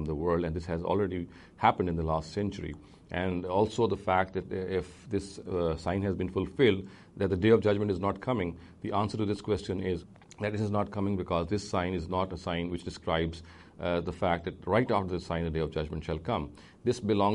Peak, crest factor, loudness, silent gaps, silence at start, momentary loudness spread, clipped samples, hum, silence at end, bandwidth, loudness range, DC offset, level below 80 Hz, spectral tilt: -8 dBFS; 22 dB; -31 LUFS; none; 0 s; 9 LU; under 0.1%; none; 0 s; 11 kHz; 4 LU; under 0.1%; -50 dBFS; -7 dB/octave